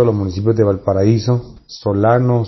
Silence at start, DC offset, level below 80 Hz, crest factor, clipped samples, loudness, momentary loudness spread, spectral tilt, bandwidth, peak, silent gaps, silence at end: 0 s; under 0.1%; -46 dBFS; 14 dB; under 0.1%; -16 LUFS; 7 LU; -8 dB/octave; 6.2 kHz; -2 dBFS; none; 0 s